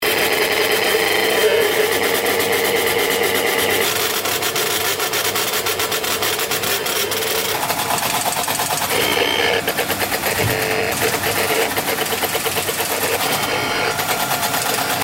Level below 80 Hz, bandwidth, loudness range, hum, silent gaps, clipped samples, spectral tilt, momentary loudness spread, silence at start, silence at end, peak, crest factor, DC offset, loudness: -50 dBFS; 16.5 kHz; 2 LU; none; none; under 0.1%; -1.5 dB/octave; 3 LU; 0 s; 0 s; -4 dBFS; 16 dB; under 0.1%; -17 LUFS